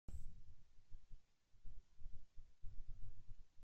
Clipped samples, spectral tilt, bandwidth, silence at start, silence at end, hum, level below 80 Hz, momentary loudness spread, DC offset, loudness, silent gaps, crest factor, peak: under 0.1%; -6.5 dB/octave; 1.4 kHz; 0.1 s; 0 s; none; -56 dBFS; 8 LU; under 0.1%; -64 LUFS; none; 12 dB; -34 dBFS